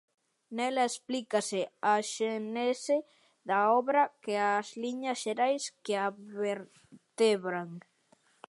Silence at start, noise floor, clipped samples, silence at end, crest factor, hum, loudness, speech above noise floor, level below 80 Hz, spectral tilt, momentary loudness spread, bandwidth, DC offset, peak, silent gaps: 0.5 s; -68 dBFS; under 0.1%; 0.7 s; 18 dB; none; -31 LUFS; 37 dB; -88 dBFS; -3.5 dB/octave; 10 LU; 11.5 kHz; under 0.1%; -14 dBFS; none